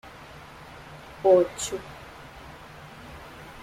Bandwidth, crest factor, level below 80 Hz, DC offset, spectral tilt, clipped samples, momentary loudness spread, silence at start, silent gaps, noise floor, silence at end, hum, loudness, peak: 15.5 kHz; 20 dB; -54 dBFS; under 0.1%; -4.5 dB/octave; under 0.1%; 24 LU; 0.05 s; none; -45 dBFS; 0 s; none; -24 LUFS; -8 dBFS